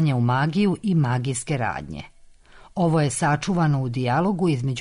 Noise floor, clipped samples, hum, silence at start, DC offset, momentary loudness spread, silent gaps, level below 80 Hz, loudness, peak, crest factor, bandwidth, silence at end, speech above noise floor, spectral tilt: -48 dBFS; under 0.1%; none; 0 s; under 0.1%; 7 LU; none; -50 dBFS; -22 LUFS; -12 dBFS; 10 dB; 11 kHz; 0 s; 27 dB; -6 dB/octave